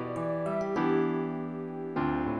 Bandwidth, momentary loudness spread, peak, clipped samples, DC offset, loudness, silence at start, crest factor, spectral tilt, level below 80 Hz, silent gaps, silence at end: 10.5 kHz; 8 LU; -16 dBFS; under 0.1%; under 0.1%; -31 LUFS; 0 s; 14 dB; -8.5 dB/octave; -56 dBFS; none; 0 s